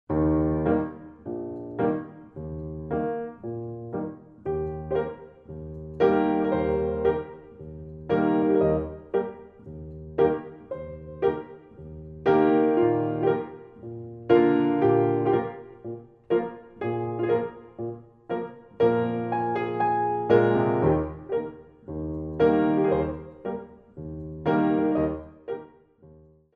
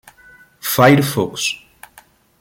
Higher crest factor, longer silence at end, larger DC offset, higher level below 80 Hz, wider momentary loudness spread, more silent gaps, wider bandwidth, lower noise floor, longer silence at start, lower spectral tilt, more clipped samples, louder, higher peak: about the same, 20 dB vs 18 dB; second, 0.45 s vs 0.85 s; neither; first, -48 dBFS vs -54 dBFS; first, 19 LU vs 14 LU; neither; second, 5.2 kHz vs 17 kHz; first, -53 dBFS vs -49 dBFS; second, 0.1 s vs 0.65 s; first, -10.5 dB/octave vs -4.5 dB/octave; neither; second, -25 LUFS vs -15 LUFS; second, -6 dBFS vs -2 dBFS